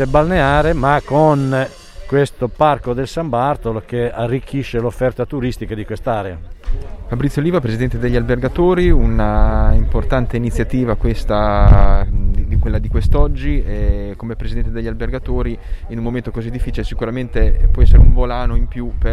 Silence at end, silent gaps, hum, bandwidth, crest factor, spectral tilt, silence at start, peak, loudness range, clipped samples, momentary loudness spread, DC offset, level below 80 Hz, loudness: 0 s; none; none; 10 kHz; 14 dB; -8 dB/octave; 0 s; 0 dBFS; 6 LU; under 0.1%; 11 LU; under 0.1%; -16 dBFS; -17 LUFS